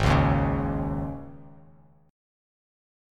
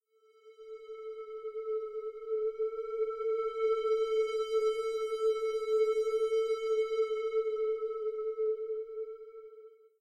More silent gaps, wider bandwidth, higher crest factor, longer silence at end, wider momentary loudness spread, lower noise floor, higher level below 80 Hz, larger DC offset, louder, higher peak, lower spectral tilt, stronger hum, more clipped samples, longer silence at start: neither; about the same, 10.5 kHz vs 9.8 kHz; first, 18 dB vs 12 dB; first, 1.6 s vs 0.25 s; first, 18 LU vs 14 LU; second, -56 dBFS vs -61 dBFS; first, -36 dBFS vs -72 dBFS; neither; first, -26 LUFS vs -33 LUFS; first, -8 dBFS vs -22 dBFS; first, -7.5 dB/octave vs -1.5 dB/octave; neither; neither; second, 0 s vs 0.45 s